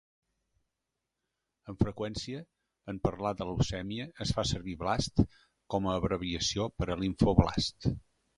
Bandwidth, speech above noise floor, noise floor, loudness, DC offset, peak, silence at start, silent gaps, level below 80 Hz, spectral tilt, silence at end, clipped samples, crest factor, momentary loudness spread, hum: 11.5 kHz; 55 dB; -86 dBFS; -32 LUFS; under 0.1%; -6 dBFS; 1.65 s; none; -44 dBFS; -5.5 dB/octave; 0.35 s; under 0.1%; 26 dB; 12 LU; none